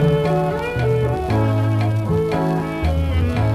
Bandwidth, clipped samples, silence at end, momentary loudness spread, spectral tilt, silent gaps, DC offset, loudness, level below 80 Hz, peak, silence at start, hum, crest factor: 13.5 kHz; under 0.1%; 0 s; 3 LU; -8 dB/octave; none; under 0.1%; -19 LUFS; -30 dBFS; -6 dBFS; 0 s; none; 12 dB